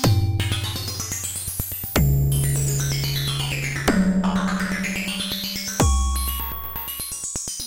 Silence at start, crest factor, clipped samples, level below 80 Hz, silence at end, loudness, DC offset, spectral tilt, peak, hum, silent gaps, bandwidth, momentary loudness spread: 0 s; 20 dB; under 0.1%; -30 dBFS; 0 s; -23 LUFS; under 0.1%; -4 dB/octave; -2 dBFS; none; none; 17 kHz; 7 LU